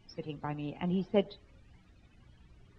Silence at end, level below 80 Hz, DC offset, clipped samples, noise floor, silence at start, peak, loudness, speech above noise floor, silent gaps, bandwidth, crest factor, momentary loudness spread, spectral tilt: 0.35 s; -62 dBFS; under 0.1%; under 0.1%; -60 dBFS; 0.1 s; -14 dBFS; -35 LUFS; 26 dB; none; 6 kHz; 22 dB; 12 LU; -8.5 dB/octave